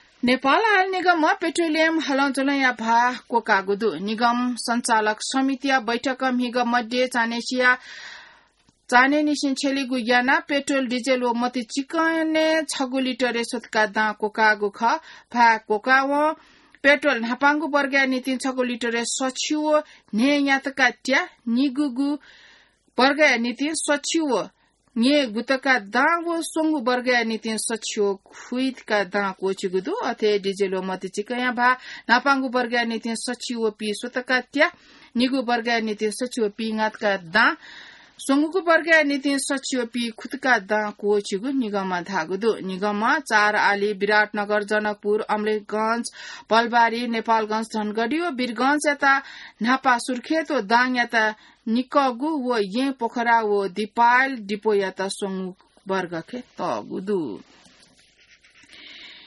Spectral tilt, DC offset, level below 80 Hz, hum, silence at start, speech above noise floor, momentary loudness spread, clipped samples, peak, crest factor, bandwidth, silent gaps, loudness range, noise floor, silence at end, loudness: -3.5 dB/octave; under 0.1%; -68 dBFS; none; 0.25 s; 39 dB; 9 LU; under 0.1%; -4 dBFS; 18 dB; 11.5 kHz; none; 3 LU; -61 dBFS; 0.1 s; -22 LUFS